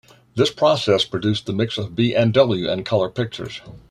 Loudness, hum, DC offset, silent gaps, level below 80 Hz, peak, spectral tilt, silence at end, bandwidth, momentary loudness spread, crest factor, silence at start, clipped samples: -20 LUFS; none; under 0.1%; none; -54 dBFS; -2 dBFS; -6 dB/octave; 0.1 s; 12.5 kHz; 13 LU; 18 dB; 0.35 s; under 0.1%